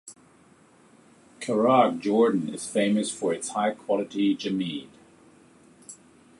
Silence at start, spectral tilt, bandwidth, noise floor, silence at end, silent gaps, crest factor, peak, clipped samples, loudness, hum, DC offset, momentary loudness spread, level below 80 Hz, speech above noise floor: 0.05 s; -5 dB/octave; 11.5 kHz; -57 dBFS; 0.45 s; none; 22 dB; -6 dBFS; under 0.1%; -25 LUFS; none; under 0.1%; 17 LU; -72 dBFS; 33 dB